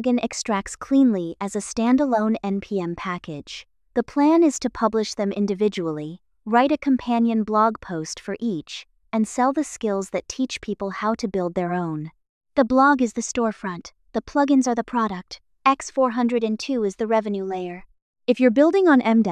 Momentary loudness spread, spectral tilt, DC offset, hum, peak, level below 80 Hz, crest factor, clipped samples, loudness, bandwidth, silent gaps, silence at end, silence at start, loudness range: 14 LU; -5 dB/octave; under 0.1%; none; -4 dBFS; -56 dBFS; 18 dB; under 0.1%; -22 LUFS; 11.5 kHz; 12.29-12.41 s, 18.02-18.14 s; 0 s; 0 s; 3 LU